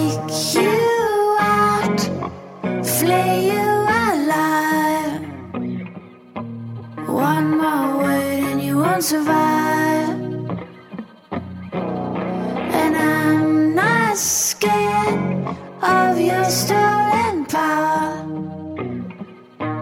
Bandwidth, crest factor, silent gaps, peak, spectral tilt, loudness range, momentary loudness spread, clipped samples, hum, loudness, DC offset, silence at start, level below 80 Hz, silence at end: 17.5 kHz; 14 dB; none; -4 dBFS; -4.5 dB/octave; 5 LU; 14 LU; under 0.1%; none; -18 LUFS; under 0.1%; 0 s; -60 dBFS; 0 s